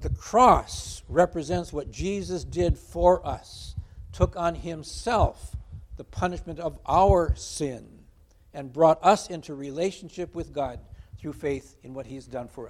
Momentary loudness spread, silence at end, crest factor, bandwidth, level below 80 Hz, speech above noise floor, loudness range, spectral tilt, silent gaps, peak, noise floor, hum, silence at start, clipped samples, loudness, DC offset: 21 LU; 0 s; 22 dB; 14.5 kHz; -38 dBFS; 30 dB; 5 LU; -6 dB/octave; none; -4 dBFS; -56 dBFS; none; 0 s; under 0.1%; -26 LUFS; under 0.1%